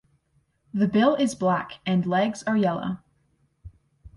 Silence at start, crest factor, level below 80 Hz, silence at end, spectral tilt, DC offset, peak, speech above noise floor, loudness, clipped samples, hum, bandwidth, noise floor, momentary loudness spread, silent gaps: 0.75 s; 18 dB; -58 dBFS; 0.1 s; -6.5 dB/octave; under 0.1%; -6 dBFS; 45 dB; -24 LUFS; under 0.1%; none; 11.5 kHz; -68 dBFS; 11 LU; none